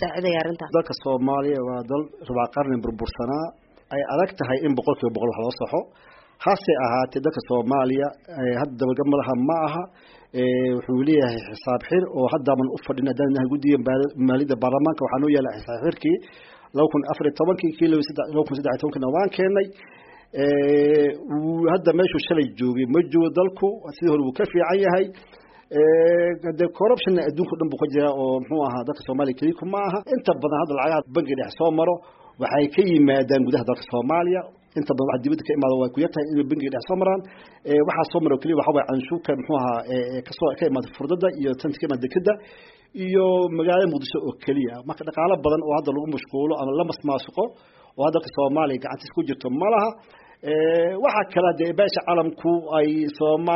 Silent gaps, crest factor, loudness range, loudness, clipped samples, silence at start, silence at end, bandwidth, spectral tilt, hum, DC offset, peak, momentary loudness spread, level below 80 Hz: none; 16 dB; 4 LU; -22 LUFS; under 0.1%; 0 s; 0 s; 5.8 kHz; -5.5 dB/octave; none; under 0.1%; -6 dBFS; 8 LU; -56 dBFS